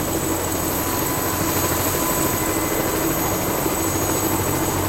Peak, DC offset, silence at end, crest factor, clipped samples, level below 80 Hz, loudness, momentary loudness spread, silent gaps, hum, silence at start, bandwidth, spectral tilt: -8 dBFS; under 0.1%; 0 s; 14 dB; under 0.1%; -38 dBFS; -20 LUFS; 2 LU; none; none; 0 s; 16 kHz; -3.5 dB/octave